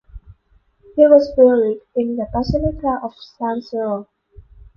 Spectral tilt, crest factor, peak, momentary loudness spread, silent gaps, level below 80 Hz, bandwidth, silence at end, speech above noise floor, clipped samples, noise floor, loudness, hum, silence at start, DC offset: -8.5 dB/octave; 18 dB; 0 dBFS; 15 LU; none; -38 dBFS; 6.6 kHz; 0.75 s; 41 dB; under 0.1%; -58 dBFS; -17 LUFS; none; 0.15 s; under 0.1%